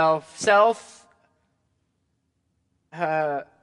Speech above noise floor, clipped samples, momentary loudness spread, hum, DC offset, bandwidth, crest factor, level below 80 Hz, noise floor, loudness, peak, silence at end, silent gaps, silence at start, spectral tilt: 51 dB; under 0.1%; 12 LU; none; under 0.1%; 11 kHz; 20 dB; -74 dBFS; -73 dBFS; -22 LUFS; -6 dBFS; 0.2 s; none; 0 s; -3.5 dB/octave